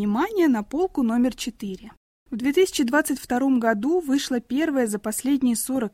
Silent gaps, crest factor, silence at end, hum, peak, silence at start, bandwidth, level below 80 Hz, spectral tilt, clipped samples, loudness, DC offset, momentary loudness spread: 1.97-2.26 s; 14 dB; 0.05 s; none; -8 dBFS; 0 s; 16.5 kHz; -54 dBFS; -4 dB/octave; under 0.1%; -23 LUFS; under 0.1%; 9 LU